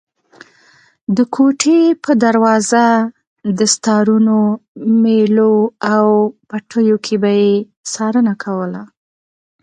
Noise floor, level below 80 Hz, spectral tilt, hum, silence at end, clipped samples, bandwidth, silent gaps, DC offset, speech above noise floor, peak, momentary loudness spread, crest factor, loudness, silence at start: -50 dBFS; -62 dBFS; -5 dB/octave; none; 0.75 s; under 0.1%; 9.8 kHz; 3.27-3.36 s, 4.68-4.75 s, 7.77-7.84 s; under 0.1%; 38 dB; 0 dBFS; 10 LU; 14 dB; -14 LUFS; 1.1 s